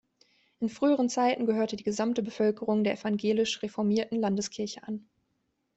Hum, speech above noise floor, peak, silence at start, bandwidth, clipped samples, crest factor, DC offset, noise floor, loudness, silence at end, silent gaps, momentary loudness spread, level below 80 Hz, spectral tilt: none; 49 dB; -14 dBFS; 0.6 s; 8.2 kHz; under 0.1%; 16 dB; under 0.1%; -77 dBFS; -29 LUFS; 0.75 s; none; 9 LU; -70 dBFS; -5 dB/octave